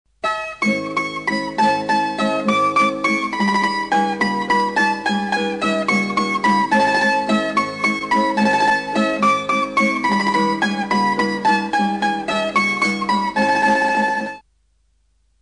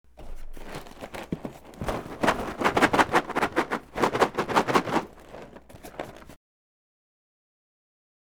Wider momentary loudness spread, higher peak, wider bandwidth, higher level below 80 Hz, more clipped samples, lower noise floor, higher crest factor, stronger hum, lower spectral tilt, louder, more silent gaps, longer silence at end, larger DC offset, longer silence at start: second, 5 LU vs 23 LU; about the same, -6 dBFS vs -4 dBFS; second, 10.5 kHz vs over 20 kHz; second, -54 dBFS vs -46 dBFS; neither; first, -62 dBFS vs -46 dBFS; second, 12 dB vs 24 dB; neither; about the same, -4.5 dB/octave vs -4.5 dB/octave; first, -18 LUFS vs -26 LUFS; neither; second, 1.05 s vs 1.95 s; second, under 0.1% vs 0.1%; about the same, 0.25 s vs 0.2 s